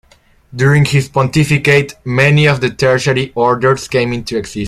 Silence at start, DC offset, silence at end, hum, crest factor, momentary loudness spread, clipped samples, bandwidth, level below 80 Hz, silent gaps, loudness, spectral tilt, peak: 0.55 s; under 0.1%; 0 s; none; 12 dB; 7 LU; under 0.1%; 13 kHz; -42 dBFS; none; -13 LUFS; -6 dB/octave; 0 dBFS